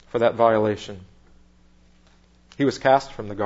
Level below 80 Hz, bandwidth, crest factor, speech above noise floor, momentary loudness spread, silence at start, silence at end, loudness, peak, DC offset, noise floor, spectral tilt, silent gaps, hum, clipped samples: -54 dBFS; 8 kHz; 20 dB; 34 dB; 17 LU; 0.15 s; 0 s; -21 LUFS; -4 dBFS; under 0.1%; -55 dBFS; -6 dB/octave; none; none; under 0.1%